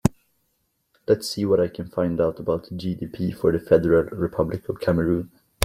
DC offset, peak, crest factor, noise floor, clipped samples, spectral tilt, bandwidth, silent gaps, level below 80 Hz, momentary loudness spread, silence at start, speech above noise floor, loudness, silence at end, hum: under 0.1%; -2 dBFS; 22 dB; -72 dBFS; under 0.1%; -6.5 dB/octave; 15.5 kHz; none; -48 dBFS; 10 LU; 0.05 s; 49 dB; -23 LUFS; 0 s; none